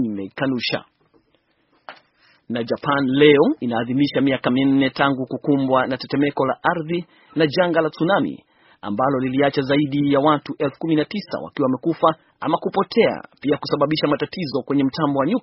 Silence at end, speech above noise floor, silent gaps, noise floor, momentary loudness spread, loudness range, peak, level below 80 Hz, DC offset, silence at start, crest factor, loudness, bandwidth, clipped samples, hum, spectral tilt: 0 s; 45 dB; none; -64 dBFS; 9 LU; 3 LU; 0 dBFS; -60 dBFS; under 0.1%; 0 s; 20 dB; -20 LUFS; 6 kHz; under 0.1%; none; -4.5 dB/octave